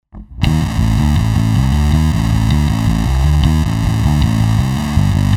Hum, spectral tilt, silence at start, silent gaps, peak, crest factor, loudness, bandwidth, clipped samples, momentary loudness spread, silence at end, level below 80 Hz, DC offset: none; -6.5 dB/octave; 0.15 s; none; 0 dBFS; 12 dB; -14 LUFS; 16.5 kHz; under 0.1%; 2 LU; 0 s; -18 dBFS; under 0.1%